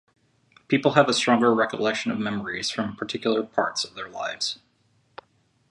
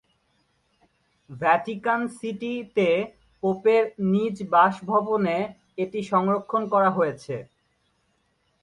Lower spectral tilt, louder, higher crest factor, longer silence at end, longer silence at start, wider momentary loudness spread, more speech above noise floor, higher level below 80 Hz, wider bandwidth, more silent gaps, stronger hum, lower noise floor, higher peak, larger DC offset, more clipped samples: second, -4 dB/octave vs -7 dB/octave; about the same, -24 LUFS vs -24 LUFS; first, 24 dB vs 18 dB; about the same, 1.15 s vs 1.2 s; second, 0.7 s vs 1.3 s; about the same, 10 LU vs 11 LU; second, 42 dB vs 46 dB; about the same, -66 dBFS vs -66 dBFS; about the same, 11.5 kHz vs 11 kHz; neither; neither; second, -65 dBFS vs -70 dBFS; first, -2 dBFS vs -6 dBFS; neither; neither